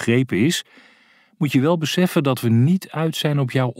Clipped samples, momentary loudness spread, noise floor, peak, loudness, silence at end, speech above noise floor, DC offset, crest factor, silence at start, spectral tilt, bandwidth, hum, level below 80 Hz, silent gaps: under 0.1%; 4 LU; -55 dBFS; -4 dBFS; -19 LUFS; 0.05 s; 36 dB; under 0.1%; 16 dB; 0 s; -6 dB/octave; 16 kHz; none; -66 dBFS; none